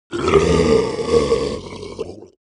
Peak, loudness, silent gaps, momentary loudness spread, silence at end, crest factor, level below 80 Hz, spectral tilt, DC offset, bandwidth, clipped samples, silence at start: 0 dBFS; -17 LUFS; none; 17 LU; 0.15 s; 18 dB; -34 dBFS; -5.5 dB/octave; under 0.1%; 10.5 kHz; under 0.1%; 0.1 s